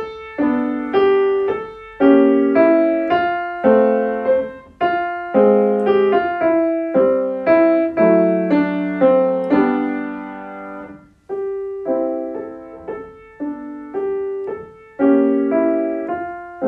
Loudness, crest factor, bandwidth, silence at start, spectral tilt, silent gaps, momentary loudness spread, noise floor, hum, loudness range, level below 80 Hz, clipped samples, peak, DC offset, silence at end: -17 LUFS; 16 dB; 5.4 kHz; 0 s; -9 dB/octave; none; 16 LU; -38 dBFS; none; 10 LU; -56 dBFS; under 0.1%; -2 dBFS; under 0.1%; 0 s